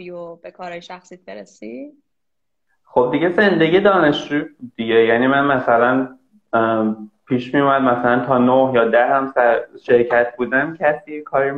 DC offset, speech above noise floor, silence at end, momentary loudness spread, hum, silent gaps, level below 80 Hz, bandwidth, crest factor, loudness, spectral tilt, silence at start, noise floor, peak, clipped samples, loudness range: under 0.1%; 64 dB; 0 s; 19 LU; none; none; -56 dBFS; 7.6 kHz; 16 dB; -16 LUFS; -7 dB/octave; 0 s; -81 dBFS; -2 dBFS; under 0.1%; 4 LU